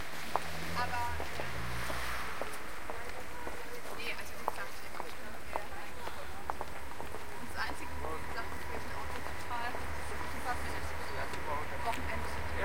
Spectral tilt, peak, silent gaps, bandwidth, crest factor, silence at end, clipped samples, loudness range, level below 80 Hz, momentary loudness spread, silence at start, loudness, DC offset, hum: -4 dB/octave; -12 dBFS; none; 16.5 kHz; 28 dB; 0 s; under 0.1%; 3 LU; -50 dBFS; 6 LU; 0 s; -40 LUFS; 2%; none